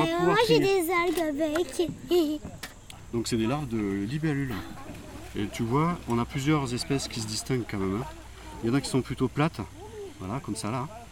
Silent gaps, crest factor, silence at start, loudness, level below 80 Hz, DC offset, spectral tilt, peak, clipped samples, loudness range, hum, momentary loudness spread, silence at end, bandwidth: none; 18 dB; 0 s; -28 LUFS; -48 dBFS; under 0.1%; -5.5 dB/octave; -10 dBFS; under 0.1%; 4 LU; none; 17 LU; 0 s; 18 kHz